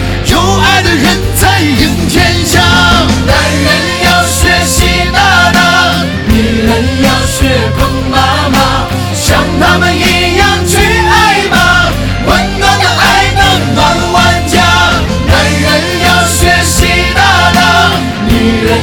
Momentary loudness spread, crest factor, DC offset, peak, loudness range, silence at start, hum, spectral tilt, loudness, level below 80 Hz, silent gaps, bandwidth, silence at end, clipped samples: 4 LU; 8 dB; under 0.1%; 0 dBFS; 2 LU; 0 s; none; -4 dB/octave; -7 LUFS; -18 dBFS; none; 19.5 kHz; 0 s; 1%